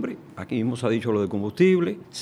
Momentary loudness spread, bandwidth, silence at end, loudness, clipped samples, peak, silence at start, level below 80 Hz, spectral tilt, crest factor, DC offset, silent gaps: 11 LU; 11 kHz; 0 s; -24 LUFS; under 0.1%; -6 dBFS; 0 s; -64 dBFS; -7 dB/octave; 16 dB; under 0.1%; none